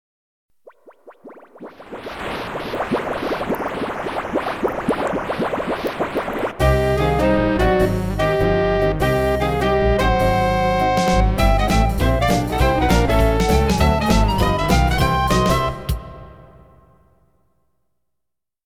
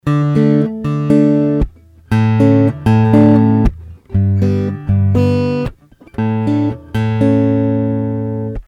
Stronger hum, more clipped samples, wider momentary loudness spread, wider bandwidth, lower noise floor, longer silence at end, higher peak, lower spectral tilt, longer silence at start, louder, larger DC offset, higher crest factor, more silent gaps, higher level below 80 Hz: neither; neither; about the same, 9 LU vs 9 LU; first, 17.5 kHz vs 7.2 kHz; first, -81 dBFS vs -38 dBFS; first, 2.25 s vs 0.05 s; about the same, -2 dBFS vs 0 dBFS; second, -6 dB/octave vs -9.5 dB/octave; first, 0.85 s vs 0.05 s; second, -19 LUFS vs -14 LUFS; first, 0.1% vs under 0.1%; about the same, 16 dB vs 12 dB; neither; about the same, -26 dBFS vs -30 dBFS